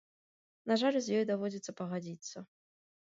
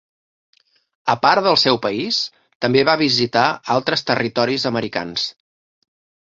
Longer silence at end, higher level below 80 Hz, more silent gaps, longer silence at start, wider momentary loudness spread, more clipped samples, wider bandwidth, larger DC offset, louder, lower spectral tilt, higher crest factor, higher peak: second, 0.6 s vs 0.9 s; second, -84 dBFS vs -60 dBFS; second, none vs 2.55-2.60 s; second, 0.65 s vs 1.05 s; first, 16 LU vs 9 LU; neither; about the same, 8 kHz vs 7.8 kHz; neither; second, -34 LUFS vs -18 LUFS; about the same, -5 dB/octave vs -4.5 dB/octave; about the same, 18 dB vs 18 dB; second, -18 dBFS vs -2 dBFS